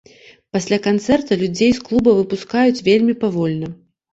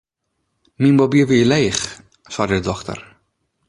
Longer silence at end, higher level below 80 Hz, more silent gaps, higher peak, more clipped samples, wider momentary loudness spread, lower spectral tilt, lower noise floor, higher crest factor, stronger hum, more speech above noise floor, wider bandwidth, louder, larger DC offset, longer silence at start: second, 0.4 s vs 0.65 s; about the same, -48 dBFS vs -46 dBFS; neither; about the same, -2 dBFS vs -2 dBFS; neither; second, 9 LU vs 16 LU; about the same, -6 dB/octave vs -5.5 dB/octave; second, -46 dBFS vs -73 dBFS; about the same, 14 dB vs 16 dB; neither; second, 30 dB vs 57 dB; second, 8 kHz vs 11.5 kHz; about the same, -17 LUFS vs -17 LUFS; neither; second, 0.55 s vs 0.8 s